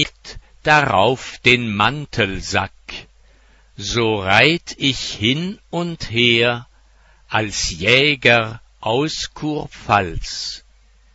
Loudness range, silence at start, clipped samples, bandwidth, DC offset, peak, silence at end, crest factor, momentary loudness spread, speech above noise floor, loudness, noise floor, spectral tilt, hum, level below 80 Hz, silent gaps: 2 LU; 0 s; under 0.1%; 8.6 kHz; under 0.1%; 0 dBFS; 0.55 s; 20 dB; 15 LU; 34 dB; -17 LUFS; -52 dBFS; -4 dB/octave; none; -40 dBFS; none